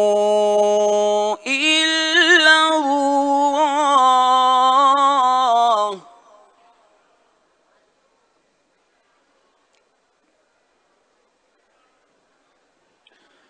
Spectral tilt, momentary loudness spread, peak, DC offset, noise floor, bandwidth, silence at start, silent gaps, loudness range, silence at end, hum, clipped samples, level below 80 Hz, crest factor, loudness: -1.5 dB/octave; 6 LU; 0 dBFS; under 0.1%; -64 dBFS; 10.5 kHz; 0 s; none; 8 LU; 7.5 s; none; under 0.1%; -80 dBFS; 18 dB; -15 LUFS